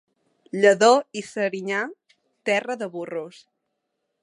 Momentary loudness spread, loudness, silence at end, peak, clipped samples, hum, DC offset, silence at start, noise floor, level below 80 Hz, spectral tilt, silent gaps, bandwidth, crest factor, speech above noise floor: 17 LU; -22 LUFS; 0.95 s; -4 dBFS; under 0.1%; none; under 0.1%; 0.55 s; -78 dBFS; -78 dBFS; -3.5 dB/octave; none; 11.5 kHz; 20 dB; 56 dB